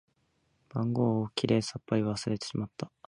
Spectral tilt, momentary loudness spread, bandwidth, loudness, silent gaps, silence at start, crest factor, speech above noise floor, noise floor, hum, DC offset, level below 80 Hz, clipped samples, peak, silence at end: -6 dB/octave; 8 LU; 11 kHz; -31 LUFS; none; 0.75 s; 18 dB; 43 dB; -73 dBFS; none; under 0.1%; -64 dBFS; under 0.1%; -12 dBFS; 0.2 s